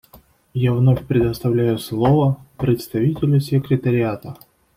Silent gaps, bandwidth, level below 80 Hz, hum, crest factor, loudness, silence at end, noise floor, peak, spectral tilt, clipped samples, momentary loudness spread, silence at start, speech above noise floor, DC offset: none; 16 kHz; -44 dBFS; none; 14 dB; -19 LUFS; 0.4 s; -50 dBFS; -4 dBFS; -8.5 dB/octave; under 0.1%; 7 LU; 0.55 s; 32 dB; under 0.1%